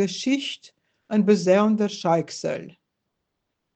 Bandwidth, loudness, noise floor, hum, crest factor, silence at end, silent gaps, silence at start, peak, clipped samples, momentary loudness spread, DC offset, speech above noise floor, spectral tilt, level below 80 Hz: 8.6 kHz; -22 LUFS; -79 dBFS; none; 18 dB; 1.05 s; none; 0 s; -6 dBFS; under 0.1%; 13 LU; under 0.1%; 57 dB; -5.5 dB/octave; -70 dBFS